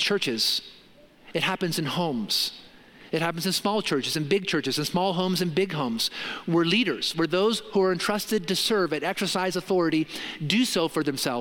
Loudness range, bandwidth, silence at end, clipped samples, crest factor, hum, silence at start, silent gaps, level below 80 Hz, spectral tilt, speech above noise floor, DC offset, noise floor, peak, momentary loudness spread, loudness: 3 LU; 17 kHz; 0 s; under 0.1%; 20 dB; none; 0 s; none; -64 dBFS; -4 dB/octave; 27 dB; under 0.1%; -52 dBFS; -6 dBFS; 5 LU; -25 LUFS